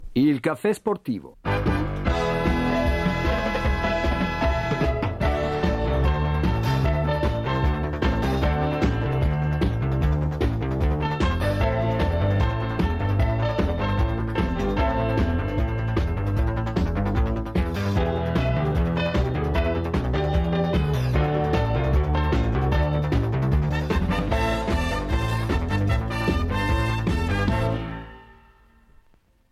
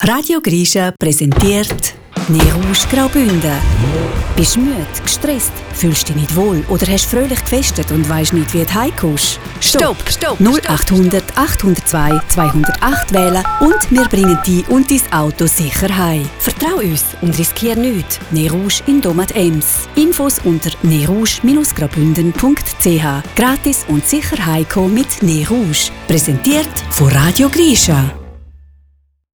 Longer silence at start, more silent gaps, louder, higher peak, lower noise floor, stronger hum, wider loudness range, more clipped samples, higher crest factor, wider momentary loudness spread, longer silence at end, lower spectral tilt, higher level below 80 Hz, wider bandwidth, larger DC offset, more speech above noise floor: about the same, 0 s vs 0 s; neither; second, -24 LUFS vs -13 LUFS; second, -8 dBFS vs 0 dBFS; first, -59 dBFS vs -52 dBFS; neither; about the same, 2 LU vs 2 LU; neither; about the same, 14 dB vs 12 dB; about the same, 3 LU vs 5 LU; first, 1.3 s vs 0.8 s; first, -7.5 dB/octave vs -4.5 dB/octave; about the same, -28 dBFS vs -24 dBFS; second, 13.5 kHz vs over 20 kHz; neither; second, 36 dB vs 40 dB